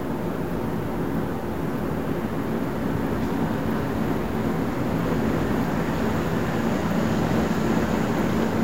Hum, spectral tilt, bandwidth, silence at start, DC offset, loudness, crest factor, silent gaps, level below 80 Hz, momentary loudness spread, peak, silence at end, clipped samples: none; -7 dB/octave; 16 kHz; 0 s; 2%; -25 LUFS; 14 dB; none; -40 dBFS; 4 LU; -10 dBFS; 0 s; under 0.1%